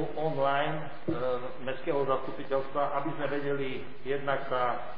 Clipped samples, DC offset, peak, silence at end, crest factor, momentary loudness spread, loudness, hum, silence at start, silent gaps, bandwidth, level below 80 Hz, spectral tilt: under 0.1%; 2%; -14 dBFS; 0 s; 18 dB; 7 LU; -32 LUFS; none; 0 s; none; 5.2 kHz; -60 dBFS; -9 dB/octave